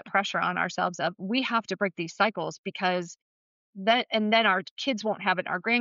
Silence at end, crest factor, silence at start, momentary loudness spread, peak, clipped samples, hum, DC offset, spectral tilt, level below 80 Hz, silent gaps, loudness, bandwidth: 0 s; 16 dB; 0.05 s; 8 LU; -12 dBFS; under 0.1%; none; under 0.1%; -2 dB/octave; -80 dBFS; 2.58-2.64 s, 3.22-3.73 s, 4.71-4.77 s; -27 LUFS; 7.6 kHz